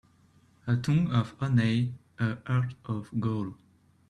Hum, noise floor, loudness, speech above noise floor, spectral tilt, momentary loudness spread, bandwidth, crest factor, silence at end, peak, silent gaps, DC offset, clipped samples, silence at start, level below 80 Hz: none; -62 dBFS; -29 LUFS; 34 dB; -7.5 dB/octave; 9 LU; 10 kHz; 16 dB; 0.55 s; -12 dBFS; none; under 0.1%; under 0.1%; 0.65 s; -60 dBFS